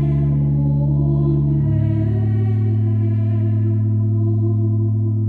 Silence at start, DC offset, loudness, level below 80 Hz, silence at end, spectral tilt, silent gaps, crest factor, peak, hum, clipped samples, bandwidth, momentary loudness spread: 0 s; under 0.1%; -18 LUFS; -34 dBFS; 0 s; -12.5 dB/octave; none; 10 dB; -8 dBFS; none; under 0.1%; 2.4 kHz; 1 LU